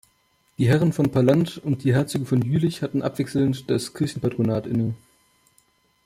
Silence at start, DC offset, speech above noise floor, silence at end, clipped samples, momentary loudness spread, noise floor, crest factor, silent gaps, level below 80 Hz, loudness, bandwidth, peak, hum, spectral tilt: 0.6 s; under 0.1%; 43 dB; 1.1 s; under 0.1%; 7 LU; -65 dBFS; 16 dB; none; -56 dBFS; -23 LUFS; 15.5 kHz; -6 dBFS; none; -7 dB/octave